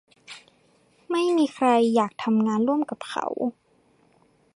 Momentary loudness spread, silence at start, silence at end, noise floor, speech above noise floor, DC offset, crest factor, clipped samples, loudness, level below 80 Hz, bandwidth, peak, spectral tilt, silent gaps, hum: 23 LU; 0.3 s; 1.05 s; -62 dBFS; 39 dB; under 0.1%; 16 dB; under 0.1%; -24 LUFS; -74 dBFS; 11.5 kHz; -8 dBFS; -5.5 dB/octave; none; none